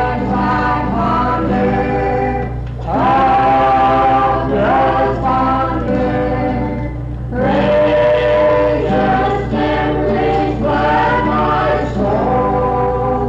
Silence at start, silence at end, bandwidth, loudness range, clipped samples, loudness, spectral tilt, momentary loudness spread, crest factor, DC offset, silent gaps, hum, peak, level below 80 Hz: 0 s; 0 s; 7.8 kHz; 2 LU; under 0.1%; -14 LUFS; -8 dB/octave; 6 LU; 8 dB; under 0.1%; none; none; -6 dBFS; -28 dBFS